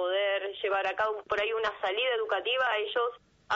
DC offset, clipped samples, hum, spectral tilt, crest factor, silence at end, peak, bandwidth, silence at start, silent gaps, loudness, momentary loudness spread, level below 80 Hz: under 0.1%; under 0.1%; none; 2 dB/octave; 12 dB; 0 s; -18 dBFS; 7.6 kHz; 0 s; none; -29 LUFS; 4 LU; -68 dBFS